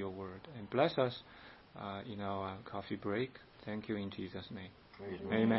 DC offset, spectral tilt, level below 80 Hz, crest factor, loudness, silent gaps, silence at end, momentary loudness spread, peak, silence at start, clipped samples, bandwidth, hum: under 0.1%; -5 dB/octave; -70 dBFS; 24 dB; -40 LUFS; none; 0 s; 17 LU; -16 dBFS; 0 s; under 0.1%; 5.6 kHz; none